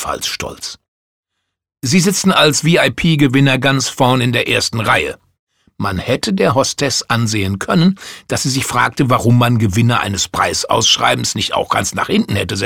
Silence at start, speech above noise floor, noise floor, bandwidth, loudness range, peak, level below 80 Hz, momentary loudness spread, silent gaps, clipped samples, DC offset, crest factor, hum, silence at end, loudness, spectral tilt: 0 s; 61 dB; -75 dBFS; 17 kHz; 3 LU; 0 dBFS; -44 dBFS; 9 LU; 0.88-1.23 s, 5.39-5.47 s; under 0.1%; 0.2%; 14 dB; none; 0 s; -14 LUFS; -4 dB/octave